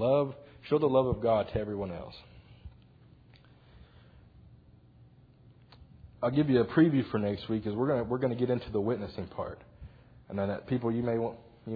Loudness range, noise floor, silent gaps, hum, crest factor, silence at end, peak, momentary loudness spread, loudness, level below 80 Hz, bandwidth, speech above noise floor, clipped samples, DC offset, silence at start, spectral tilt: 10 LU; -58 dBFS; none; none; 20 dB; 0 s; -12 dBFS; 15 LU; -30 LUFS; -56 dBFS; 5 kHz; 28 dB; under 0.1%; under 0.1%; 0 s; -7 dB/octave